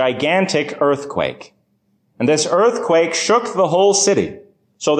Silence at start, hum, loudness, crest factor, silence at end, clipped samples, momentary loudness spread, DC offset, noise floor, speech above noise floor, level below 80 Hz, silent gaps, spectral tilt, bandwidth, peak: 0 s; none; -16 LUFS; 14 dB; 0 s; under 0.1%; 9 LU; under 0.1%; -63 dBFS; 47 dB; -56 dBFS; none; -3.5 dB/octave; 10 kHz; -4 dBFS